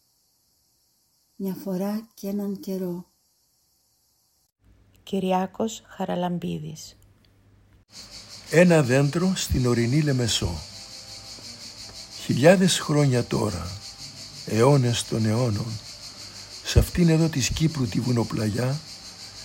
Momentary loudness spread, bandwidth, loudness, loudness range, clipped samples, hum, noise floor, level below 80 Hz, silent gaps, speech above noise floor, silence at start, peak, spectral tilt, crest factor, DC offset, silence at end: 19 LU; 16.5 kHz; -23 LUFS; 10 LU; under 0.1%; none; -67 dBFS; -42 dBFS; none; 44 dB; 1.4 s; -2 dBFS; -5.5 dB/octave; 22 dB; under 0.1%; 0 s